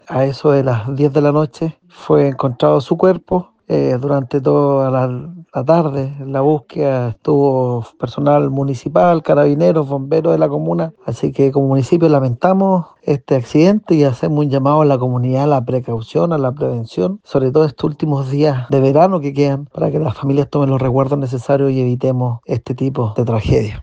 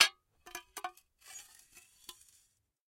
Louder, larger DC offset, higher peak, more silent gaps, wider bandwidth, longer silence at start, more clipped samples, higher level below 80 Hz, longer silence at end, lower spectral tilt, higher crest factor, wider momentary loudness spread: first, -15 LUFS vs -38 LUFS; neither; first, 0 dBFS vs -8 dBFS; neither; second, 8 kHz vs 16.5 kHz; about the same, 0.1 s vs 0 s; neither; first, -44 dBFS vs -78 dBFS; second, 0 s vs 1.55 s; first, -9 dB/octave vs 2.5 dB/octave; second, 14 dB vs 32 dB; second, 8 LU vs 15 LU